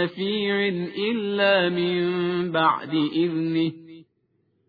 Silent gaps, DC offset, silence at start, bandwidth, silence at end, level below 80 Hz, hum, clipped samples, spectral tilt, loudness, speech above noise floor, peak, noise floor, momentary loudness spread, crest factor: none; under 0.1%; 0 s; 4.9 kHz; 0.65 s; -66 dBFS; none; under 0.1%; -8.5 dB/octave; -23 LUFS; 46 dB; -8 dBFS; -69 dBFS; 6 LU; 16 dB